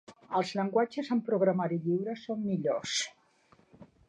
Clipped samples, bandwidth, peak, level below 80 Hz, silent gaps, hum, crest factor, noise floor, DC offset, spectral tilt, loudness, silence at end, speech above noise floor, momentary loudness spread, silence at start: under 0.1%; 10.5 kHz; -14 dBFS; -74 dBFS; none; none; 18 dB; -65 dBFS; under 0.1%; -5 dB/octave; -31 LUFS; 0.25 s; 34 dB; 6 LU; 0.1 s